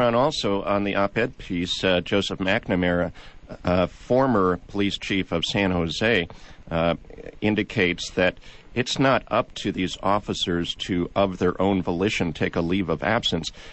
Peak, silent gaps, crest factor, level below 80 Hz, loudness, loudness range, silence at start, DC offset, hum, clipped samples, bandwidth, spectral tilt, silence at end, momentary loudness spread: -8 dBFS; none; 16 dB; -46 dBFS; -24 LUFS; 1 LU; 0 s; under 0.1%; none; under 0.1%; 8.4 kHz; -5.5 dB/octave; 0 s; 6 LU